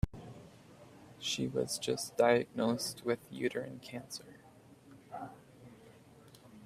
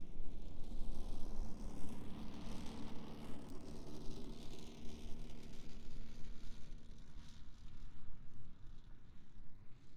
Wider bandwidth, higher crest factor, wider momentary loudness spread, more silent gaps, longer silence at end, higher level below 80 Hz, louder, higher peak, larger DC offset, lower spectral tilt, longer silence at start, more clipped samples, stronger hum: first, 16 kHz vs 9 kHz; first, 24 dB vs 12 dB; first, 27 LU vs 11 LU; neither; about the same, 0 s vs 0 s; second, -56 dBFS vs -50 dBFS; first, -35 LUFS vs -55 LUFS; first, -14 dBFS vs -26 dBFS; neither; second, -4 dB/octave vs -6 dB/octave; about the same, 0.05 s vs 0 s; neither; neither